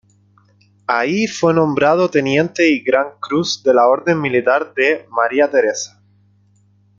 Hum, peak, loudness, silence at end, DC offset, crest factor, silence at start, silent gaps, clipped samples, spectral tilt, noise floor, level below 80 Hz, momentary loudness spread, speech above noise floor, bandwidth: 50 Hz at -45 dBFS; 0 dBFS; -16 LUFS; 1.1 s; under 0.1%; 16 dB; 0.9 s; none; under 0.1%; -5 dB/octave; -54 dBFS; -60 dBFS; 6 LU; 39 dB; 7.6 kHz